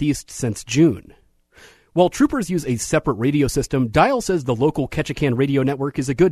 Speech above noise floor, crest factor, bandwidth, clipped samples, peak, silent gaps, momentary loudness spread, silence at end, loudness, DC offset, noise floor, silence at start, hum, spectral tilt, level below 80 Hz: 31 dB; 18 dB; 13.5 kHz; under 0.1%; -2 dBFS; none; 7 LU; 0 s; -20 LUFS; under 0.1%; -50 dBFS; 0 s; none; -6 dB/octave; -42 dBFS